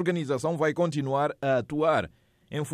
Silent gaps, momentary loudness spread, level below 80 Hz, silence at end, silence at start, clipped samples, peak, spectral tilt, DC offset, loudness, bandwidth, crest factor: none; 8 LU; -64 dBFS; 0 s; 0 s; under 0.1%; -12 dBFS; -6.5 dB/octave; under 0.1%; -27 LUFS; 15 kHz; 14 dB